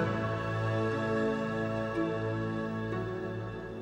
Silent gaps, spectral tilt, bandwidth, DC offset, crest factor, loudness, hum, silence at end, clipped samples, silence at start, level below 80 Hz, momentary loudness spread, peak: none; -7.5 dB/octave; 9.4 kHz; under 0.1%; 14 dB; -33 LUFS; none; 0 s; under 0.1%; 0 s; -56 dBFS; 6 LU; -18 dBFS